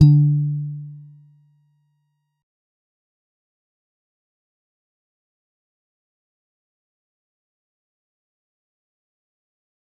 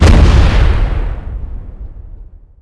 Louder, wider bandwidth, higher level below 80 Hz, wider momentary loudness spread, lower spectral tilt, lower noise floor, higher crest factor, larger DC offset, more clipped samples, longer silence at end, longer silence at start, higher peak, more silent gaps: second, -19 LUFS vs -12 LUFS; second, 5.2 kHz vs 11 kHz; second, -58 dBFS vs -12 dBFS; about the same, 25 LU vs 24 LU; first, -12 dB/octave vs -6.5 dB/octave; first, -71 dBFS vs -33 dBFS; first, 24 dB vs 10 dB; neither; second, under 0.1% vs 1%; first, 9 s vs 0.4 s; about the same, 0 s vs 0 s; about the same, -2 dBFS vs 0 dBFS; neither